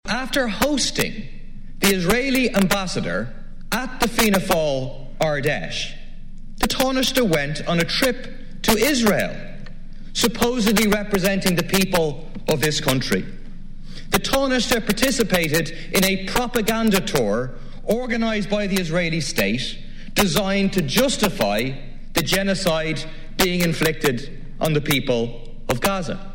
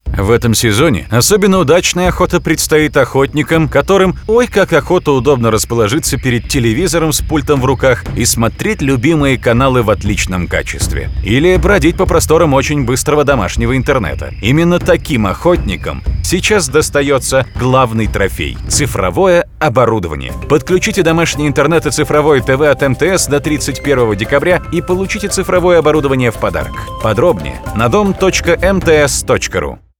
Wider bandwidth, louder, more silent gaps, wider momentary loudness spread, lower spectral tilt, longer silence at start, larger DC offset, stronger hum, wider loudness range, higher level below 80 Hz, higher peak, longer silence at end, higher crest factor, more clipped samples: second, 17 kHz vs 19 kHz; second, -21 LUFS vs -12 LUFS; neither; first, 11 LU vs 6 LU; about the same, -4 dB/octave vs -5 dB/octave; about the same, 0.05 s vs 0.05 s; neither; neither; about the same, 2 LU vs 2 LU; second, -32 dBFS vs -24 dBFS; second, -4 dBFS vs 0 dBFS; second, 0 s vs 0.25 s; first, 18 dB vs 12 dB; neither